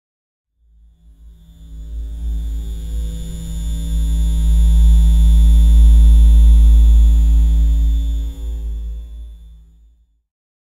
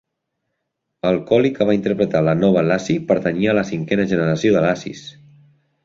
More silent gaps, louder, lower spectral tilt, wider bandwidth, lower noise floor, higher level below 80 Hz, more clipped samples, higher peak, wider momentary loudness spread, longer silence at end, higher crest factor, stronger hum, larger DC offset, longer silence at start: neither; first, -15 LUFS vs -18 LUFS; about the same, -7 dB/octave vs -7 dB/octave; first, 11 kHz vs 7.8 kHz; second, -52 dBFS vs -76 dBFS; first, -14 dBFS vs -52 dBFS; neither; about the same, -2 dBFS vs -2 dBFS; first, 18 LU vs 7 LU; first, 1.4 s vs 0.75 s; about the same, 12 dB vs 16 dB; neither; neither; first, 1.6 s vs 1.05 s